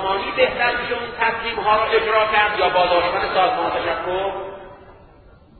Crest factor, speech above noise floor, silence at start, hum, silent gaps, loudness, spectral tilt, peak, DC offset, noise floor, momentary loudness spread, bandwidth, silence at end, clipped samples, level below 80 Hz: 18 dB; 28 dB; 0 s; none; none; -19 LUFS; -8.5 dB/octave; -2 dBFS; under 0.1%; -48 dBFS; 8 LU; 4.5 kHz; 0.7 s; under 0.1%; -46 dBFS